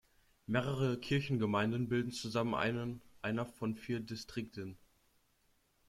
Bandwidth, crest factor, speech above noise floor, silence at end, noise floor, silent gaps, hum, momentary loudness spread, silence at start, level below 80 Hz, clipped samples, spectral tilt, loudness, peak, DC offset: 15 kHz; 20 dB; 38 dB; 1.1 s; -74 dBFS; none; none; 10 LU; 0.5 s; -66 dBFS; under 0.1%; -6.5 dB/octave; -37 LUFS; -18 dBFS; under 0.1%